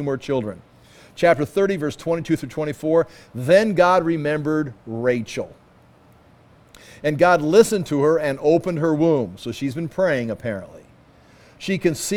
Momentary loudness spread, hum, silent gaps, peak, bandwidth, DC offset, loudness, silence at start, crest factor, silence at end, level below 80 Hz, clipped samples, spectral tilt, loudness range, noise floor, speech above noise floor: 13 LU; none; none; -2 dBFS; 17 kHz; under 0.1%; -20 LUFS; 0 s; 20 dB; 0 s; -54 dBFS; under 0.1%; -6 dB/octave; 5 LU; -52 dBFS; 32 dB